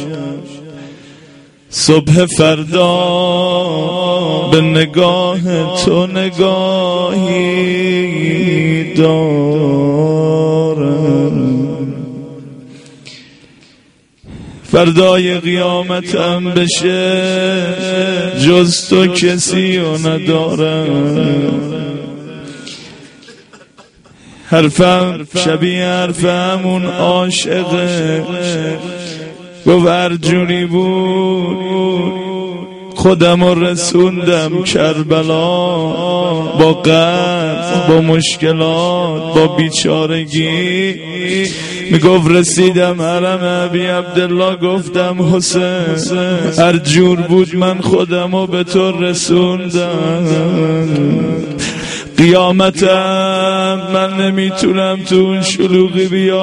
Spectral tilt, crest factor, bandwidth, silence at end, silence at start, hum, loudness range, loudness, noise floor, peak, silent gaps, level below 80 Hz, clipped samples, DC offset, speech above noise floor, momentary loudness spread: -5 dB/octave; 12 dB; 11 kHz; 0 s; 0 s; none; 4 LU; -12 LUFS; -49 dBFS; 0 dBFS; none; -46 dBFS; 0.2%; under 0.1%; 37 dB; 9 LU